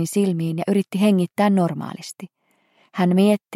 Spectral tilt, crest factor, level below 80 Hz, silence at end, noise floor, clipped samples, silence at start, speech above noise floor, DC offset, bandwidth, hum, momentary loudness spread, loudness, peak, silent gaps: -7 dB/octave; 14 dB; -72 dBFS; 0 s; -61 dBFS; under 0.1%; 0 s; 41 dB; under 0.1%; 15 kHz; none; 16 LU; -20 LUFS; -6 dBFS; none